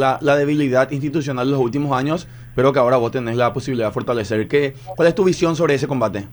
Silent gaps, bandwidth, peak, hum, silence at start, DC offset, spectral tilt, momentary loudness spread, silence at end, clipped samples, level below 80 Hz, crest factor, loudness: none; over 20 kHz; -2 dBFS; none; 0 s; under 0.1%; -6.5 dB/octave; 6 LU; 0 s; under 0.1%; -48 dBFS; 16 dB; -18 LUFS